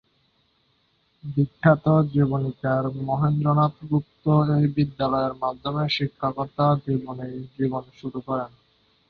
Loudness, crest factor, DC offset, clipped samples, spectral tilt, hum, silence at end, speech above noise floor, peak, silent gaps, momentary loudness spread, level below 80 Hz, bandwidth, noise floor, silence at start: -24 LUFS; 20 dB; under 0.1%; under 0.1%; -9.5 dB/octave; none; 0.6 s; 44 dB; -4 dBFS; none; 12 LU; -56 dBFS; 5 kHz; -67 dBFS; 1.25 s